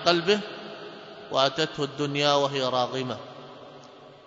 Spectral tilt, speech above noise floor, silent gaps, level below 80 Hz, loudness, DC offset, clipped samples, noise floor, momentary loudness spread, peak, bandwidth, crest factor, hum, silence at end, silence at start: -4 dB/octave; 23 dB; none; -70 dBFS; -25 LUFS; under 0.1%; under 0.1%; -48 dBFS; 22 LU; -6 dBFS; 7.8 kHz; 22 dB; none; 0.1 s; 0 s